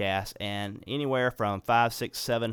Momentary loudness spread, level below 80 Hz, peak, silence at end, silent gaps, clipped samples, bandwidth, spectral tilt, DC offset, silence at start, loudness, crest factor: 9 LU; -58 dBFS; -10 dBFS; 0 s; none; under 0.1%; 19.5 kHz; -4.5 dB/octave; under 0.1%; 0 s; -29 LUFS; 18 dB